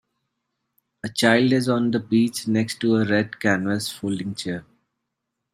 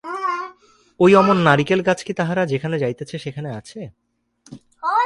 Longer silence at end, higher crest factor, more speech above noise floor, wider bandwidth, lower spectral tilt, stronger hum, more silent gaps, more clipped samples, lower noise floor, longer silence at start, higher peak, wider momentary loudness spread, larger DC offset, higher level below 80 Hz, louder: first, 0.9 s vs 0 s; about the same, 22 dB vs 20 dB; first, 59 dB vs 38 dB; first, 15 kHz vs 11.5 kHz; second, -5 dB/octave vs -6.5 dB/octave; neither; neither; neither; first, -80 dBFS vs -56 dBFS; first, 1.05 s vs 0.05 s; about the same, -2 dBFS vs 0 dBFS; second, 12 LU vs 20 LU; neither; second, -64 dBFS vs -58 dBFS; second, -22 LUFS vs -18 LUFS